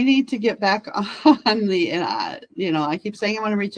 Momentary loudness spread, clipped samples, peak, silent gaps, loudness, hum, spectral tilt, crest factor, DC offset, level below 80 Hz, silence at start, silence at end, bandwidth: 9 LU; under 0.1%; -2 dBFS; none; -21 LUFS; none; -5.5 dB/octave; 18 dB; under 0.1%; -66 dBFS; 0 s; 0 s; 9.8 kHz